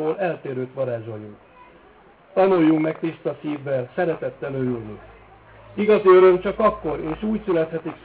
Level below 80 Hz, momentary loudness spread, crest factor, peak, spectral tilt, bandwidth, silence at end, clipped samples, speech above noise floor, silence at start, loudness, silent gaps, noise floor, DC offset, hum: -52 dBFS; 16 LU; 16 dB; -6 dBFS; -11 dB/octave; 4 kHz; 0.05 s; under 0.1%; 30 dB; 0 s; -21 LUFS; none; -51 dBFS; under 0.1%; none